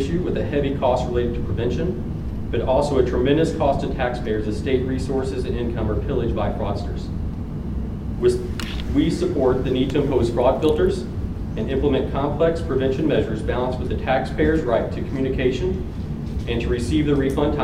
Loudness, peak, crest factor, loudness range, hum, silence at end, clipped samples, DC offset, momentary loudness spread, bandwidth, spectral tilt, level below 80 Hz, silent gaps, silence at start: -22 LUFS; -4 dBFS; 16 dB; 3 LU; none; 0 s; under 0.1%; under 0.1%; 9 LU; 13 kHz; -7.5 dB/octave; -30 dBFS; none; 0 s